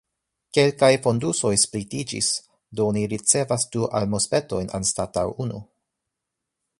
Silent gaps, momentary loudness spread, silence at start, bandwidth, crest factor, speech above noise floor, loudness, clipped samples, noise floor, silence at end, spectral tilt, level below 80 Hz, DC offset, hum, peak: none; 11 LU; 0.55 s; 11.5 kHz; 20 dB; 61 dB; -22 LUFS; under 0.1%; -83 dBFS; 1.15 s; -3.5 dB/octave; -52 dBFS; under 0.1%; none; -4 dBFS